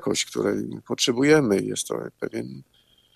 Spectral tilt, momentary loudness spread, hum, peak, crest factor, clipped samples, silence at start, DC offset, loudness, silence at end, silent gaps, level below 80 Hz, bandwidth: -4 dB/octave; 14 LU; none; -6 dBFS; 18 dB; under 0.1%; 0 s; under 0.1%; -24 LUFS; 0.55 s; none; -62 dBFS; 14.5 kHz